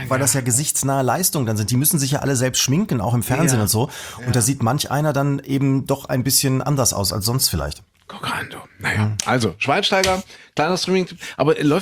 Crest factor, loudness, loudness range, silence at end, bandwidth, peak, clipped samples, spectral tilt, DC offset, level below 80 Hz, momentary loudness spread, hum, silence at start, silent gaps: 18 dB; -19 LUFS; 2 LU; 0 s; over 20 kHz; -2 dBFS; under 0.1%; -4 dB/octave; under 0.1%; -46 dBFS; 9 LU; none; 0 s; none